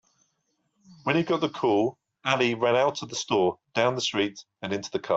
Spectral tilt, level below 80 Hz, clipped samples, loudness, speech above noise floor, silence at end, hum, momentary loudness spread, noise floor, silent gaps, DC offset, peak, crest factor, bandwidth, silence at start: -4.5 dB/octave; -68 dBFS; under 0.1%; -26 LUFS; 49 dB; 0 s; none; 9 LU; -75 dBFS; none; under 0.1%; -8 dBFS; 20 dB; 8 kHz; 0.9 s